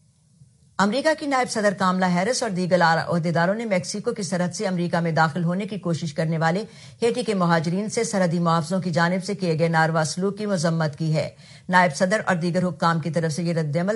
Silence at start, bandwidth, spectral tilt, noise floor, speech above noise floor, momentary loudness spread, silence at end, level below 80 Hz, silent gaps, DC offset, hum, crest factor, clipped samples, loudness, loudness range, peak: 0.8 s; 11.5 kHz; -5.5 dB/octave; -55 dBFS; 33 dB; 6 LU; 0 s; -66 dBFS; none; under 0.1%; none; 18 dB; under 0.1%; -22 LUFS; 2 LU; -4 dBFS